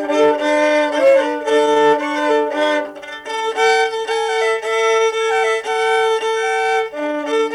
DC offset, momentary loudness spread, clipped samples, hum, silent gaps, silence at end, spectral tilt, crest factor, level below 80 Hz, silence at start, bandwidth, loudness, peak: under 0.1%; 8 LU; under 0.1%; none; none; 0 s; -2 dB/octave; 12 dB; -62 dBFS; 0 s; 12 kHz; -16 LUFS; -4 dBFS